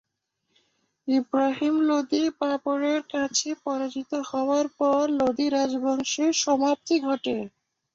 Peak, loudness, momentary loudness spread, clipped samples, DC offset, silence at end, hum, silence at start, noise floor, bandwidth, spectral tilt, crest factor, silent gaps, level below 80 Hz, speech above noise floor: -10 dBFS; -25 LUFS; 7 LU; under 0.1%; under 0.1%; 0.45 s; none; 1.05 s; -78 dBFS; 7.8 kHz; -2.5 dB/octave; 14 dB; none; -68 dBFS; 54 dB